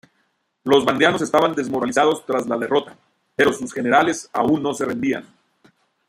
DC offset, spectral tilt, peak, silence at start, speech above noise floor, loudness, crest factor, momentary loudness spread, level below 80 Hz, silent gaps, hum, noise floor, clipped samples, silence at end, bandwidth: under 0.1%; -4.5 dB/octave; -2 dBFS; 0.65 s; 49 dB; -19 LUFS; 18 dB; 7 LU; -60 dBFS; none; none; -68 dBFS; under 0.1%; 0.85 s; 16 kHz